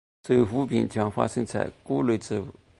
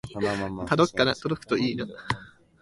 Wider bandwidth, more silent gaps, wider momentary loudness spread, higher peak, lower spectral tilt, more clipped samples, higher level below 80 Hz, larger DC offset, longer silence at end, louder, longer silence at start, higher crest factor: about the same, 11.5 kHz vs 11.5 kHz; neither; about the same, 8 LU vs 10 LU; about the same, -6 dBFS vs -8 dBFS; first, -7 dB/octave vs -5.5 dB/octave; neither; about the same, -54 dBFS vs -52 dBFS; neither; about the same, 0.3 s vs 0.35 s; about the same, -26 LUFS vs -27 LUFS; first, 0.25 s vs 0.05 s; about the same, 20 dB vs 20 dB